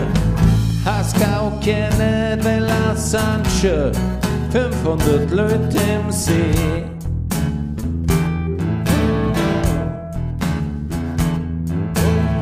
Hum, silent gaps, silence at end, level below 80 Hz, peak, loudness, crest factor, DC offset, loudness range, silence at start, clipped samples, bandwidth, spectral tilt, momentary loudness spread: none; none; 0 s; -28 dBFS; -2 dBFS; -19 LUFS; 16 dB; under 0.1%; 3 LU; 0 s; under 0.1%; 15.5 kHz; -6 dB/octave; 6 LU